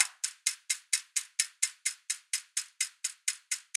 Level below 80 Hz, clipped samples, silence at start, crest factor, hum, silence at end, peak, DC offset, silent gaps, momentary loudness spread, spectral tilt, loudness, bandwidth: under -90 dBFS; under 0.1%; 0 s; 28 dB; none; 0.15 s; -6 dBFS; under 0.1%; none; 5 LU; 11.5 dB/octave; -32 LUFS; 16 kHz